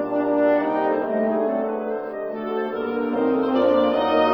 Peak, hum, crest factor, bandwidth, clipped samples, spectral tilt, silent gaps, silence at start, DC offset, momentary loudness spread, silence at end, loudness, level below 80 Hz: -6 dBFS; none; 14 dB; over 20 kHz; under 0.1%; -7.5 dB/octave; none; 0 s; under 0.1%; 8 LU; 0 s; -22 LUFS; -60 dBFS